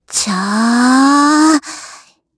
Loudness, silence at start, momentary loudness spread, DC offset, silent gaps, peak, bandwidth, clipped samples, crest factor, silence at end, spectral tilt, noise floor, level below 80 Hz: -11 LUFS; 0.1 s; 11 LU; under 0.1%; none; 0 dBFS; 11 kHz; under 0.1%; 12 dB; 0.45 s; -3 dB/octave; -40 dBFS; -58 dBFS